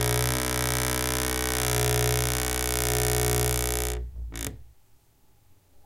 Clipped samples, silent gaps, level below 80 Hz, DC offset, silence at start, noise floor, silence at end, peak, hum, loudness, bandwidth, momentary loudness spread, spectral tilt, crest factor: under 0.1%; none; -36 dBFS; under 0.1%; 0 s; -59 dBFS; 0.05 s; -6 dBFS; none; -26 LUFS; 17 kHz; 11 LU; -3 dB/octave; 22 dB